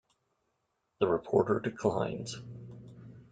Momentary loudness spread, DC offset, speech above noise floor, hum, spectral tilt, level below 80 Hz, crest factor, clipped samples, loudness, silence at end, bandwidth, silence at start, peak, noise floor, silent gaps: 22 LU; under 0.1%; 49 dB; none; -6.5 dB/octave; -66 dBFS; 22 dB; under 0.1%; -31 LUFS; 0.1 s; 9.2 kHz; 1 s; -12 dBFS; -80 dBFS; none